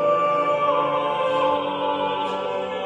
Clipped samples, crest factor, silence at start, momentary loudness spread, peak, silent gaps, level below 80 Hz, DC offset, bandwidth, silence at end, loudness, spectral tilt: under 0.1%; 14 dB; 0 s; 5 LU; -8 dBFS; none; -68 dBFS; under 0.1%; 9.4 kHz; 0 s; -22 LUFS; -5.5 dB/octave